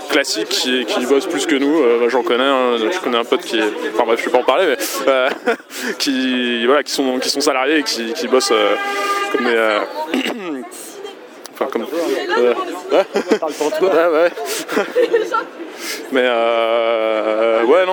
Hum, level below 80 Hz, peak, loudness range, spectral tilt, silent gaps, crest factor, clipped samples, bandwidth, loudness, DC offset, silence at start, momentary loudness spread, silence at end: none; -74 dBFS; 0 dBFS; 4 LU; -2 dB/octave; none; 16 dB; under 0.1%; over 20 kHz; -17 LUFS; under 0.1%; 0 s; 8 LU; 0 s